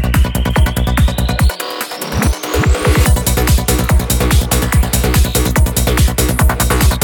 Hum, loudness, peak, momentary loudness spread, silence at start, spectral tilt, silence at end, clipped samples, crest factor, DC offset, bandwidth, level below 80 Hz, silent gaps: none; -14 LUFS; 0 dBFS; 4 LU; 0 s; -4.5 dB/octave; 0 s; under 0.1%; 12 dB; under 0.1%; 19.5 kHz; -16 dBFS; none